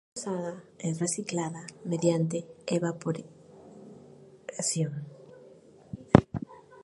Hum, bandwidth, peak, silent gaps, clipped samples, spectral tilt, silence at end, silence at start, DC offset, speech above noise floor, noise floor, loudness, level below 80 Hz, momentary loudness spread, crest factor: none; 11.5 kHz; 0 dBFS; none; under 0.1%; -5.5 dB/octave; 0 s; 0.15 s; under 0.1%; 23 dB; -54 dBFS; -30 LUFS; -54 dBFS; 25 LU; 30 dB